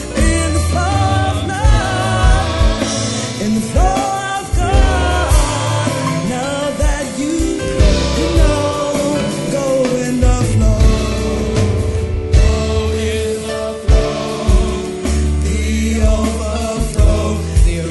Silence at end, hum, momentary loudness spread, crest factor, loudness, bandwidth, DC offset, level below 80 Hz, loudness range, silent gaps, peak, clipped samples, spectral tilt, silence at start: 0 s; none; 5 LU; 14 dB; -16 LUFS; 12 kHz; under 0.1%; -18 dBFS; 1 LU; none; 0 dBFS; under 0.1%; -5.5 dB/octave; 0 s